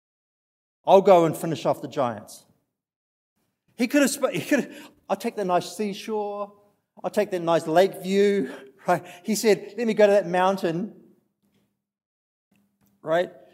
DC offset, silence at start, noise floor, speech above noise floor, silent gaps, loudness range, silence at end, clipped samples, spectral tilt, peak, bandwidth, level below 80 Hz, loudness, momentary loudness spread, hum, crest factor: under 0.1%; 0.85 s; -70 dBFS; 48 dB; 2.96-3.36 s, 12.06-12.51 s; 5 LU; 0.25 s; under 0.1%; -5 dB/octave; -2 dBFS; 16 kHz; -80 dBFS; -23 LUFS; 14 LU; none; 22 dB